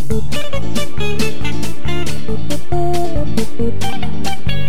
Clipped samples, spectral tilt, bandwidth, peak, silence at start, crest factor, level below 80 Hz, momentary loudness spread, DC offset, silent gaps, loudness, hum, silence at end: under 0.1%; -5.5 dB/octave; 18 kHz; 0 dBFS; 0 s; 16 dB; -30 dBFS; 4 LU; 40%; none; -22 LUFS; none; 0 s